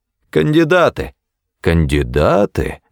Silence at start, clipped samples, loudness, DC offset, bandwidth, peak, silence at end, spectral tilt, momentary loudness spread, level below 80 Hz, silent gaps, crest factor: 0.35 s; under 0.1%; -15 LUFS; under 0.1%; 17.5 kHz; -2 dBFS; 0.15 s; -7 dB/octave; 10 LU; -28 dBFS; none; 14 dB